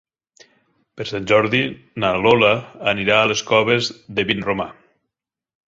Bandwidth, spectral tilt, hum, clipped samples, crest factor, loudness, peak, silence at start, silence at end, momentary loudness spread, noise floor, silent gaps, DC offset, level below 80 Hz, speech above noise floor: 7.8 kHz; -4.5 dB/octave; none; under 0.1%; 20 dB; -18 LUFS; -2 dBFS; 0.95 s; 0.95 s; 11 LU; -85 dBFS; none; under 0.1%; -52 dBFS; 67 dB